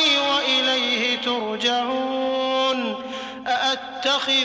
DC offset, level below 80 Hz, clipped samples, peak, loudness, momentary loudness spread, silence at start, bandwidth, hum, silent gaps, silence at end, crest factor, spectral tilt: under 0.1%; -66 dBFS; under 0.1%; -10 dBFS; -21 LUFS; 7 LU; 0 s; 8 kHz; none; none; 0 s; 12 dB; -1.5 dB/octave